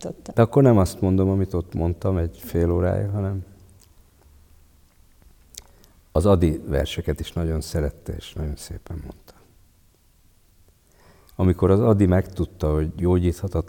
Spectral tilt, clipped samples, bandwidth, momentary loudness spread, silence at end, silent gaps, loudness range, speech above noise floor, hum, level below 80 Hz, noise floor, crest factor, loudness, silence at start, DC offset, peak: -8 dB/octave; under 0.1%; 17.5 kHz; 18 LU; 0 s; none; 12 LU; 36 dB; none; -38 dBFS; -57 dBFS; 20 dB; -22 LUFS; 0 s; under 0.1%; -4 dBFS